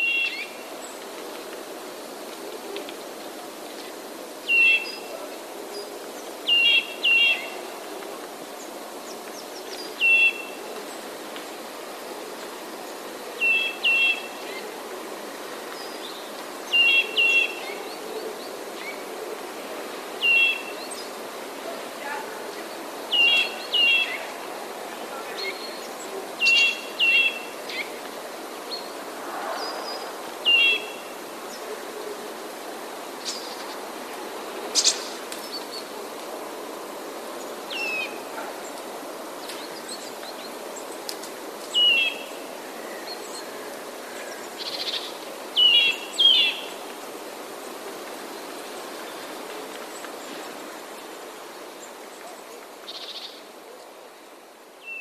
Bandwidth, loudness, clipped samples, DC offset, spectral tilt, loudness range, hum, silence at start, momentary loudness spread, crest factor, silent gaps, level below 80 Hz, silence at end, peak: 14.5 kHz; -23 LUFS; under 0.1%; under 0.1%; 0.5 dB/octave; 15 LU; none; 0 s; 19 LU; 22 dB; none; -80 dBFS; 0 s; -6 dBFS